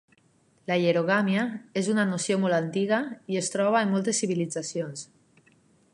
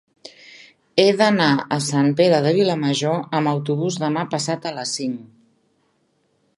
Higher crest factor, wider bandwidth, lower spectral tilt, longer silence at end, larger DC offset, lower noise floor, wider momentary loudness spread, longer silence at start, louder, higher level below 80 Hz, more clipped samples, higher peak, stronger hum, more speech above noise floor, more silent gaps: about the same, 18 dB vs 20 dB; about the same, 11.5 kHz vs 11.5 kHz; about the same, -4.5 dB/octave vs -5 dB/octave; second, 0.9 s vs 1.3 s; neither; about the same, -64 dBFS vs -66 dBFS; about the same, 9 LU vs 9 LU; first, 0.7 s vs 0.25 s; second, -26 LUFS vs -19 LUFS; second, -76 dBFS vs -70 dBFS; neither; second, -10 dBFS vs 0 dBFS; neither; second, 38 dB vs 47 dB; neither